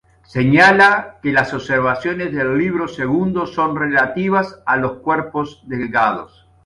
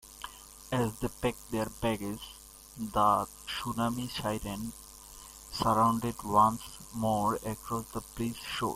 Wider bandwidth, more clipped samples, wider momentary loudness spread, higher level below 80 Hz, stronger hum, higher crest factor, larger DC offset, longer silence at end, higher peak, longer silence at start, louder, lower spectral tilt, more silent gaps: second, 11.5 kHz vs 16.5 kHz; neither; second, 11 LU vs 19 LU; about the same, -50 dBFS vs -52 dBFS; neither; second, 16 dB vs 22 dB; neither; first, 0.4 s vs 0 s; first, 0 dBFS vs -10 dBFS; first, 0.35 s vs 0.05 s; first, -16 LUFS vs -32 LUFS; first, -6.5 dB/octave vs -5 dB/octave; neither